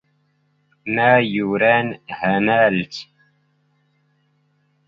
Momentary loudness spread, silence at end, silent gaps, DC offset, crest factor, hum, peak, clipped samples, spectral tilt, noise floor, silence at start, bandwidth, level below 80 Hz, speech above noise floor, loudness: 15 LU; 1.85 s; none; under 0.1%; 20 dB; 50 Hz at -45 dBFS; -2 dBFS; under 0.1%; -7 dB/octave; -64 dBFS; 0.85 s; 7.4 kHz; -60 dBFS; 46 dB; -17 LUFS